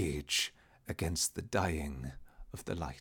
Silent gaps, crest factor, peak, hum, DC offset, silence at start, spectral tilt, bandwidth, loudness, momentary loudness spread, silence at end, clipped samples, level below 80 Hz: none; 20 dB; -18 dBFS; none; under 0.1%; 0 s; -3.5 dB/octave; 19 kHz; -36 LUFS; 15 LU; 0 s; under 0.1%; -48 dBFS